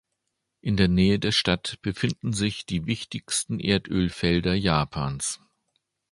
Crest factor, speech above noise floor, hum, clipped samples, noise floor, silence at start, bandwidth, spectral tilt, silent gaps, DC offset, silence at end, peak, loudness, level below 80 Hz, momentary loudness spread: 22 dB; 55 dB; none; under 0.1%; -80 dBFS; 0.65 s; 11.5 kHz; -4.5 dB/octave; none; under 0.1%; 0.75 s; -4 dBFS; -25 LUFS; -44 dBFS; 9 LU